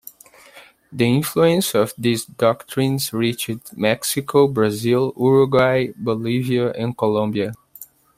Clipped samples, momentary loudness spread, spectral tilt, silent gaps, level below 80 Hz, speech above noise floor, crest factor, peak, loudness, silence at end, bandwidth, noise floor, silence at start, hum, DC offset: under 0.1%; 7 LU; -5.5 dB/octave; none; -56 dBFS; 28 dB; 18 dB; -2 dBFS; -19 LUFS; 0.35 s; 16 kHz; -47 dBFS; 0.55 s; none; under 0.1%